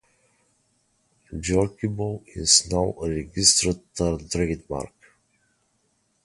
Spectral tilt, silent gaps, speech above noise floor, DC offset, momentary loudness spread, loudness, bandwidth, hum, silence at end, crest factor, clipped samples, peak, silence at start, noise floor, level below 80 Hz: -3 dB/octave; none; 45 dB; under 0.1%; 15 LU; -22 LUFS; 11.5 kHz; none; 1.4 s; 24 dB; under 0.1%; -2 dBFS; 1.3 s; -69 dBFS; -42 dBFS